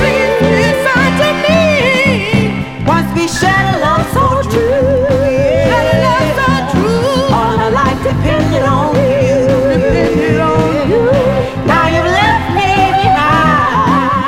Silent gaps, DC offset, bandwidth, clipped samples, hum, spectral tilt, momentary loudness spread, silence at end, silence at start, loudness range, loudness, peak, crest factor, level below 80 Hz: none; under 0.1%; 16.5 kHz; under 0.1%; none; -6 dB/octave; 3 LU; 0 s; 0 s; 1 LU; -11 LUFS; 0 dBFS; 10 dB; -28 dBFS